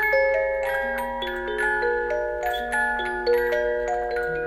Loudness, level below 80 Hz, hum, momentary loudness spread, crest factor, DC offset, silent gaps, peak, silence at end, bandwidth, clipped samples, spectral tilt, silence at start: -24 LUFS; -46 dBFS; none; 5 LU; 14 dB; under 0.1%; none; -10 dBFS; 0 s; 15 kHz; under 0.1%; -4 dB/octave; 0 s